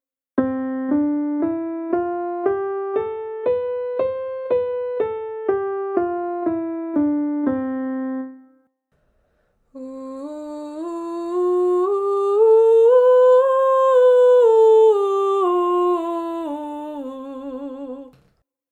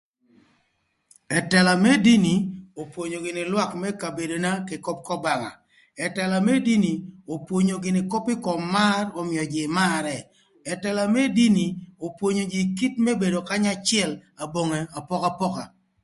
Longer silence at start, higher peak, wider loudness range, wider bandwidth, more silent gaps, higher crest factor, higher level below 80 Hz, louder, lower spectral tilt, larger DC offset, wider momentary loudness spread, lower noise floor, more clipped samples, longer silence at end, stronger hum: second, 0.35 s vs 1.3 s; about the same, -4 dBFS vs -4 dBFS; first, 13 LU vs 5 LU; second, 8.6 kHz vs 11.5 kHz; neither; about the same, 14 dB vs 18 dB; about the same, -62 dBFS vs -62 dBFS; first, -19 LUFS vs -23 LUFS; first, -6.5 dB/octave vs -5 dB/octave; neither; first, 19 LU vs 14 LU; second, -66 dBFS vs -71 dBFS; neither; first, 0.65 s vs 0.35 s; neither